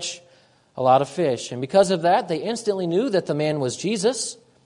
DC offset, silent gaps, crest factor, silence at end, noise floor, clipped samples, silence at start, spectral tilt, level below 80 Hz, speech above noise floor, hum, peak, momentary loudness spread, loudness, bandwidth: under 0.1%; none; 18 dB; 0.3 s; -56 dBFS; under 0.1%; 0 s; -4.5 dB/octave; -66 dBFS; 35 dB; none; -4 dBFS; 9 LU; -22 LUFS; 11 kHz